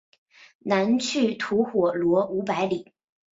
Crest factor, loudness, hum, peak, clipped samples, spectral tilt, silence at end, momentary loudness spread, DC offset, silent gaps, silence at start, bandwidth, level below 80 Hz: 16 dB; -24 LUFS; none; -8 dBFS; under 0.1%; -5 dB/octave; 0.5 s; 5 LU; under 0.1%; none; 0.65 s; 7.8 kHz; -66 dBFS